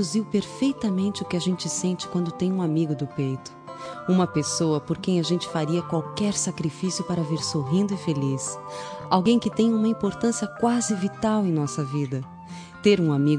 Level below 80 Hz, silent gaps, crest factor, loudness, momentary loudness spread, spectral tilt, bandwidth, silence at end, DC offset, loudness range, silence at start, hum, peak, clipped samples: -60 dBFS; none; 18 dB; -25 LUFS; 9 LU; -5.5 dB/octave; 10.5 kHz; 0 s; under 0.1%; 2 LU; 0 s; none; -6 dBFS; under 0.1%